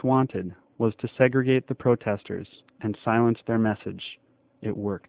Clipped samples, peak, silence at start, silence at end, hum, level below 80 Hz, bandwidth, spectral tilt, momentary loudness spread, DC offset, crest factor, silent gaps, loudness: under 0.1%; -6 dBFS; 0.05 s; 0.1 s; none; -58 dBFS; 4 kHz; -11.5 dB/octave; 14 LU; under 0.1%; 20 dB; none; -26 LUFS